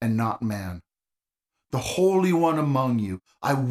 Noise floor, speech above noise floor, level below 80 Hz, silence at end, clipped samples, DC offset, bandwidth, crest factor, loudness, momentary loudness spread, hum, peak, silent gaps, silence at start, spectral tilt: -90 dBFS; 66 dB; -56 dBFS; 0 s; under 0.1%; under 0.1%; 15 kHz; 16 dB; -24 LUFS; 12 LU; none; -10 dBFS; none; 0 s; -6.5 dB/octave